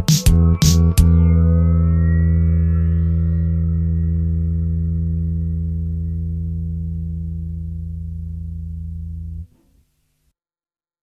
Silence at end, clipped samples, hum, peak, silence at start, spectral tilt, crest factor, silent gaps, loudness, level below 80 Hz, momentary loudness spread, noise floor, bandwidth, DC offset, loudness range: 1.55 s; under 0.1%; none; 0 dBFS; 0 s; -6.5 dB/octave; 18 dB; none; -18 LUFS; -22 dBFS; 16 LU; under -90 dBFS; 14.5 kHz; under 0.1%; 15 LU